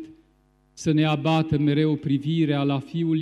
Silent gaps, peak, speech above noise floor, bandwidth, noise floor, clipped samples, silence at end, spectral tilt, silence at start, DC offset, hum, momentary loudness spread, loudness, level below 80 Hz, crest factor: none; -10 dBFS; 40 dB; 10 kHz; -62 dBFS; under 0.1%; 0 s; -7 dB/octave; 0 s; under 0.1%; none; 4 LU; -23 LUFS; -54 dBFS; 14 dB